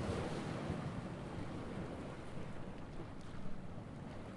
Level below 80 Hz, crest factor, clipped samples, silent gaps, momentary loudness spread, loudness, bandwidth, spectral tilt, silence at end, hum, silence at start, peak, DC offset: -56 dBFS; 16 dB; under 0.1%; none; 8 LU; -46 LUFS; 11.5 kHz; -6.5 dB/octave; 0 s; none; 0 s; -28 dBFS; under 0.1%